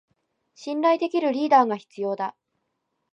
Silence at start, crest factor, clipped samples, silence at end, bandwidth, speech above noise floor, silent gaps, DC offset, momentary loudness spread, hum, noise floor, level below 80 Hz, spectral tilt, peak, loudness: 0.6 s; 18 dB; under 0.1%; 0.8 s; 8.4 kHz; 55 dB; none; under 0.1%; 13 LU; none; -77 dBFS; -84 dBFS; -5.5 dB/octave; -6 dBFS; -23 LUFS